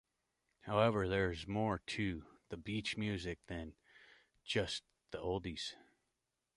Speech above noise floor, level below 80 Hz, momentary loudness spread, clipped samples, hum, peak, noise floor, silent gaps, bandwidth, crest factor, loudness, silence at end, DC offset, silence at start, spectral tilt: 49 dB; -58 dBFS; 17 LU; under 0.1%; none; -18 dBFS; -88 dBFS; none; 11.5 kHz; 22 dB; -39 LUFS; 0.8 s; under 0.1%; 0.65 s; -5.5 dB/octave